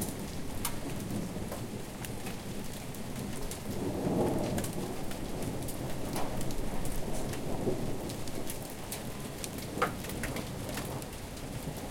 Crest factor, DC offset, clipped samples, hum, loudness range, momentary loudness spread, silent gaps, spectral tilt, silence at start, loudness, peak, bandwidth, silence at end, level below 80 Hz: 22 dB; under 0.1%; under 0.1%; none; 3 LU; 7 LU; none; -5 dB/octave; 0 s; -37 LUFS; -14 dBFS; 17 kHz; 0 s; -44 dBFS